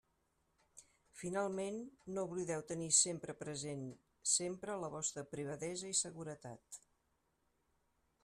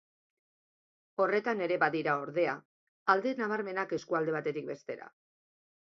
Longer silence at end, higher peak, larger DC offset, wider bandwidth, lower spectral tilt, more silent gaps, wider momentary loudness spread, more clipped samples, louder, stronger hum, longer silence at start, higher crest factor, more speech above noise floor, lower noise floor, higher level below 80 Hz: first, 1.45 s vs 0.9 s; second, -18 dBFS vs -10 dBFS; neither; first, 13.5 kHz vs 7.6 kHz; second, -2.5 dB/octave vs -6 dB/octave; second, none vs 2.65-3.06 s; first, 18 LU vs 13 LU; neither; second, -39 LUFS vs -32 LUFS; neither; second, 0.75 s vs 1.2 s; about the same, 24 dB vs 24 dB; second, 40 dB vs over 58 dB; second, -81 dBFS vs under -90 dBFS; about the same, -78 dBFS vs -82 dBFS